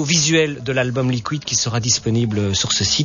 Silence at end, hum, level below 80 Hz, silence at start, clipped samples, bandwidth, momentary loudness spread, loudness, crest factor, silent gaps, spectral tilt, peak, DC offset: 0 s; none; -46 dBFS; 0 s; under 0.1%; 7.4 kHz; 6 LU; -18 LUFS; 16 dB; none; -3.5 dB/octave; -4 dBFS; under 0.1%